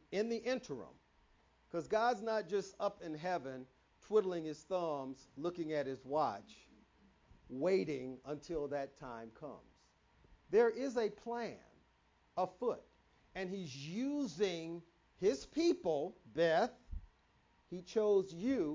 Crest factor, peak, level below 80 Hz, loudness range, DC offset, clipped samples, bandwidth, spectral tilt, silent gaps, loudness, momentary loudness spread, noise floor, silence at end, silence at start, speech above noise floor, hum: 20 dB; -20 dBFS; -64 dBFS; 5 LU; under 0.1%; under 0.1%; 7.6 kHz; -5.5 dB/octave; none; -38 LUFS; 17 LU; -73 dBFS; 0 s; 0.1 s; 35 dB; none